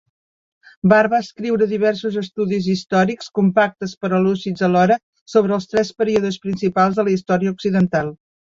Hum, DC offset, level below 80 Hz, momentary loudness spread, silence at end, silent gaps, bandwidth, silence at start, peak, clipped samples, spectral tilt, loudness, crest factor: none; under 0.1%; -56 dBFS; 7 LU; 0.35 s; 3.97-4.01 s, 5.03-5.13 s, 5.21-5.26 s; 7.4 kHz; 0.85 s; -2 dBFS; under 0.1%; -7 dB/octave; -18 LUFS; 16 dB